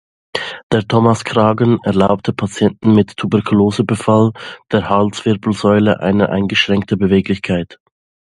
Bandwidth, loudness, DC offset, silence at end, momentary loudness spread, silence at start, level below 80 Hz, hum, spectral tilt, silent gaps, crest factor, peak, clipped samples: 11.5 kHz; -15 LUFS; under 0.1%; 0.65 s; 7 LU; 0.35 s; -42 dBFS; none; -6.5 dB/octave; 0.63-0.70 s; 14 dB; 0 dBFS; under 0.1%